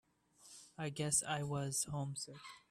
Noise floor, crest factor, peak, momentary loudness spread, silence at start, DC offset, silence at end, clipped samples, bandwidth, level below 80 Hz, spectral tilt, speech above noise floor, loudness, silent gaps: -65 dBFS; 22 dB; -20 dBFS; 20 LU; 0.4 s; under 0.1%; 0.1 s; under 0.1%; 15.5 kHz; -70 dBFS; -3.5 dB/octave; 25 dB; -39 LUFS; none